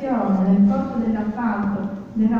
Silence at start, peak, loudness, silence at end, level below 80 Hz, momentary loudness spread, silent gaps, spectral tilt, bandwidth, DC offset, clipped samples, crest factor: 0 s; -8 dBFS; -21 LUFS; 0 s; -48 dBFS; 8 LU; none; -10 dB/octave; 4.7 kHz; under 0.1%; under 0.1%; 12 dB